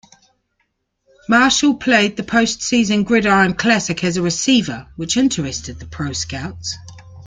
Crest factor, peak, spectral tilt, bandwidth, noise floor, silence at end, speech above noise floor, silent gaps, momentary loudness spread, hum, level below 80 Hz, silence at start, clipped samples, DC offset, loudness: 16 dB; -2 dBFS; -3.5 dB/octave; 9.6 kHz; -69 dBFS; 0 s; 52 dB; none; 14 LU; none; -46 dBFS; 1.3 s; under 0.1%; under 0.1%; -16 LUFS